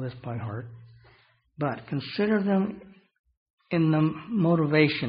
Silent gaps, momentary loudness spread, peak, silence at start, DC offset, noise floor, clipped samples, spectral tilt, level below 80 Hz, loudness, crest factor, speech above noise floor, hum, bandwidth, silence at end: 3.19-3.24 s, 3.37-3.58 s; 14 LU; -6 dBFS; 0 s; under 0.1%; -61 dBFS; under 0.1%; -6 dB/octave; -64 dBFS; -26 LUFS; 20 dB; 36 dB; none; 5.4 kHz; 0 s